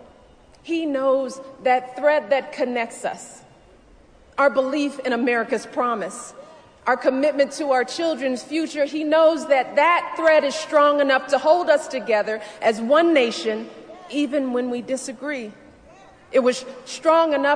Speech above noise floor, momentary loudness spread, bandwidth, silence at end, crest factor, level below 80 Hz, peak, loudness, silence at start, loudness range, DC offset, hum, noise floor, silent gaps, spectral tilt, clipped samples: 30 dB; 13 LU; 10 kHz; 0 s; 16 dB; -64 dBFS; -4 dBFS; -21 LUFS; 0.65 s; 6 LU; under 0.1%; none; -51 dBFS; none; -3 dB/octave; under 0.1%